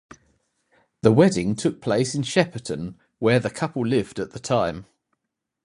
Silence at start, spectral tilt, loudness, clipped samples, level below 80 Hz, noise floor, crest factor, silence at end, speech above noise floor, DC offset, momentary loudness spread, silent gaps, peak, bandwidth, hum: 1.05 s; -6 dB/octave; -23 LUFS; under 0.1%; -54 dBFS; -82 dBFS; 22 dB; 0.8 s; 60 dB; under 0.1%; 14 LU; none; -2 dBFS; 11.5 kHz; none